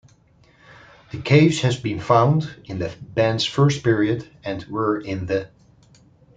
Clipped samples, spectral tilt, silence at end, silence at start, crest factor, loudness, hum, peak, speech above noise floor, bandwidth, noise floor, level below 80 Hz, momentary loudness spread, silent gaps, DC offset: under 0.1%; -6.5 dB/octave; 0.9 s; 1.15 s; 20 dB; -21 LUFS; none; -2 dBFS; 35 dB; 9.2 kHz; -55 dBFS; -54 dBFS; 15 LU; none; under 0.1%